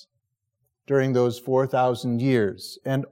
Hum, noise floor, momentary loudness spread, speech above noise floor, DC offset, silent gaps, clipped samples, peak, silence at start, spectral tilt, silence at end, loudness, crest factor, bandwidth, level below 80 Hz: none; -78 dBFS; 7 LU; 55 dB; under 0.1%; none; under 0.1%; -10 dBFS; 0.9 s; -7 dB/octave; 0.05 s; -23 LUFS; 14 dB; 16.5 kHz; -72 dBFS